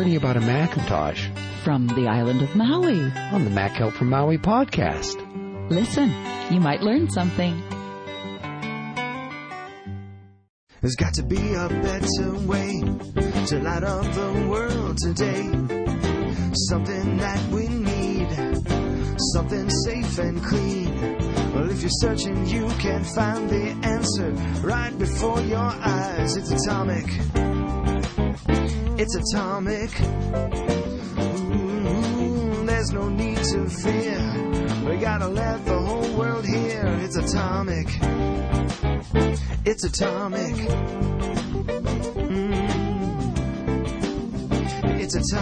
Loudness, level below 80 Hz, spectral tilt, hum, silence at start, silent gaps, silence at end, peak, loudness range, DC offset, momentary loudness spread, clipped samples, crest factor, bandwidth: -24 LUFS; -32 dBFS; -5.5 dB/octave; none; 0 s; 10.49-10.67 s; 0 s; -8 dBFS; 3 LU; under 0.1%; 6 LU; under 0.1%; 16 dB; 10 kHz